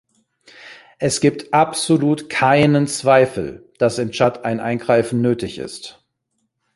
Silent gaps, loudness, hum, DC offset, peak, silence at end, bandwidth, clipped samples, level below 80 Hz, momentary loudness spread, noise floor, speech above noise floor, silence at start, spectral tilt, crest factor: none; -17 LUFS; none; under 0.1%; -2 dBFS; 0.85 s; 11.5 kHz; under 0.1%; -54 dBFS; 14 LU; -72 dBFS; 55 dB; 0.65 s; -5 dB/octave; 18 dB